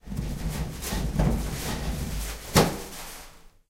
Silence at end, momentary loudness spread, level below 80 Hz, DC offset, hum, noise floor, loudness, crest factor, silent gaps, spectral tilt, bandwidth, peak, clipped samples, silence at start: 0.2 s; 15 LU; -34 dBFS; under 0.1%; none; -48 dBFS; -28 LUFS; 24 dB; none; -4.5 dB/octave; 16 kHz; -4 dBFS; under 0.1%; 0.05 s